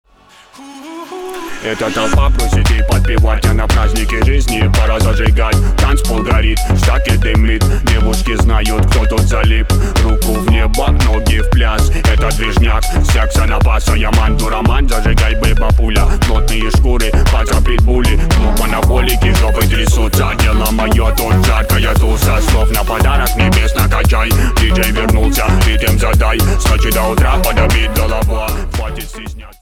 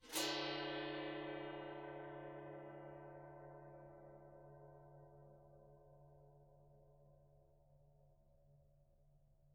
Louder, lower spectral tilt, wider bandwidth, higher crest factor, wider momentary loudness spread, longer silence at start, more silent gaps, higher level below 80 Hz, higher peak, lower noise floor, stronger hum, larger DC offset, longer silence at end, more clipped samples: first, -13 LUFS vs -48 LUFS; first, -5 dB/octave vs -2.5 dB/octave; first, 17 kHz vs 7.2 kHz; second, 10 dB vs 24 dB; second, 3 LU vs 25 LU; first, 0.6 s vs 0 s; neither; first, -12 dBFS vs -74 dBFS; first, 0 dBFS vs -28 dBFS; second, -44 dBFS vs -71 dBFS; neither; neither; first, 0.15 s vs 0 s; neither